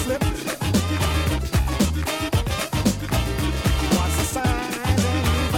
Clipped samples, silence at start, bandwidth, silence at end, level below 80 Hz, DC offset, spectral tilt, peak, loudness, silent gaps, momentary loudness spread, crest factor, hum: under 0.1%; 0 s; 18 kHz; 0 s; -28 dBFS; under 0.1%; -5 dB/octave; -6 dBFS; -22 LUFS; none; 3 LU; 14 dB; none